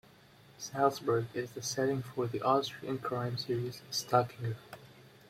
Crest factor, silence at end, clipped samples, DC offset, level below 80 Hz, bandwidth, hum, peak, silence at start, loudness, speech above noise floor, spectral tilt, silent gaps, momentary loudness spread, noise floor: 22 dB; 0.2 s; under 0.1%; under 0.1%; -70 dBFS; 16.5 kHz; none; -12 dBFS; 0.6 s; -34 LUFS; 26 dB; -5 dB/octave; none; 11 LU; -59 dBFS